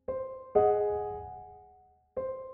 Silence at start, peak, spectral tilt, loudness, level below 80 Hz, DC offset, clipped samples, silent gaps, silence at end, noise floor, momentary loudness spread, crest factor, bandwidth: 0.1 s; -12 dBFS; -8 dB/octave; -31 LUFS; -58 dBFS; under 0.1%; under 0.1%; none; 0 s; -61 dBFS; 20 LU; 20 dB; 3.2 kHz